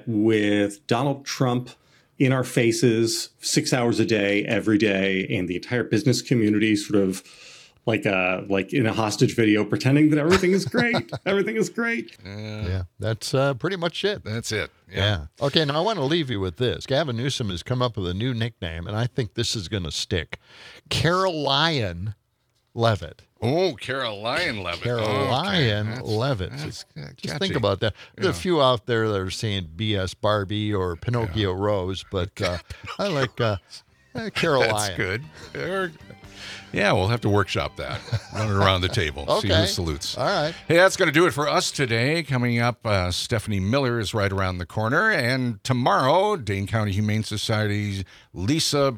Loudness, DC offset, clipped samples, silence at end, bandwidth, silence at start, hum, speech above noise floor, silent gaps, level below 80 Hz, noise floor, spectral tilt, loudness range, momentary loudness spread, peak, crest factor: -23 LUFS; under 0.1%; under 0.1%; 0 s; 16 kHz; 0.05 s; none; 46 dB; none; -52 dBFS; -69 dBFS; -5 dB/octave; 5 LU; 10 LU; 0 dBFS; 22 dB